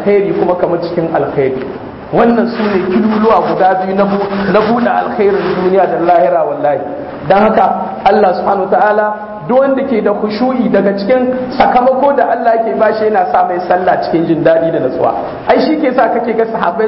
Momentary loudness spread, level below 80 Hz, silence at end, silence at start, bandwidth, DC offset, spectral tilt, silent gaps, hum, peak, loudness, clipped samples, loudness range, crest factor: 5 LU; -44 dBFS; 0 s; 0 s; 5.8 kHz; under 0.1%; -9.5 dB/octave; none; none; 0 dBFS; -11 LUFS; under 0.1%; 1 LU; 12 dB